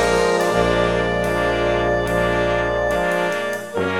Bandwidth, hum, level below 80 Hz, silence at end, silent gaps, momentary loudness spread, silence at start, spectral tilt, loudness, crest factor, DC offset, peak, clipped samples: 18.5 kHz; 60 Hz at -55 dBFS; -34 dBFS; 0 s; none; 4 LU; 0 s; -5 dB/octave; -19 LUFS; 14 dB; 0.3%; -4 dBFS; under 0.1%